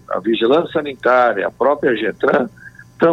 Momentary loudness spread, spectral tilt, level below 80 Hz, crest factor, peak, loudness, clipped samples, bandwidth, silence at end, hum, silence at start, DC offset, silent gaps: 5 LU; -7 dB/octave; -56 dBFS; 14 dB; -2 dBFS; -16 LUFS; under 0.1%; 8 kHz; 0 s; none; 0.1 s; under 0.1%; none